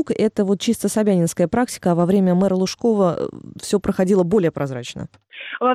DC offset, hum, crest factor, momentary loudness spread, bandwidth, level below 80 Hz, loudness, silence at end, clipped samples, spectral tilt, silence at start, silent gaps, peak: under 0.1%; none; 12 dB; 15 LU; 14.5 kHz; -50 dBFS; -19 LUFS; 0 s; under 0.1%; -6 dB/octave; 0 s; none; -8 dBFS